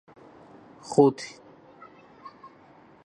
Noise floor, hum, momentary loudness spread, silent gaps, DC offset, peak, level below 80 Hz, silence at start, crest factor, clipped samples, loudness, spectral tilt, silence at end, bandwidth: -54 dBFS; none; 27 LU; none; under 0.1%; -6 dBFS; -74 dBFS; 0.9 s; 24 dB; under 0.1%; -23 LUFS; -6.5 dB/octave; 1.75 s; 10 kHz